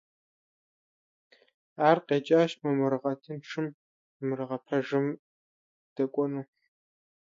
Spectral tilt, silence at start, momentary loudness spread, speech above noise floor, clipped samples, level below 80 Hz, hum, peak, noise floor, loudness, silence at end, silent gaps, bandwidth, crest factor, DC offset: -7 dB/octave; 1.8 s; 13 LU; over 62 dB; under 0.1%; -82 dBFS; none; -8 dBFS; under -90 dBFS; -29 LUFS; 0.8 s; 3.74-4.20 s, 5.19-5.96 s; 7.6 kHz; 22 dB; under 0.1%